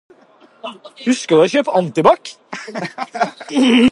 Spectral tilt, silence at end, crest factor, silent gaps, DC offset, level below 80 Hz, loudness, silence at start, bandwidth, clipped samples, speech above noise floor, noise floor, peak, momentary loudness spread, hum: -5 dB/octave; 0 s; 16 dB; none; under 0.1%; -56 dBFS; -16 LUFS; 0.65 s; 11.5 kHz; under 0.1%; 33 dB; -49 dBFS; 0 dBFS; 19 LU; none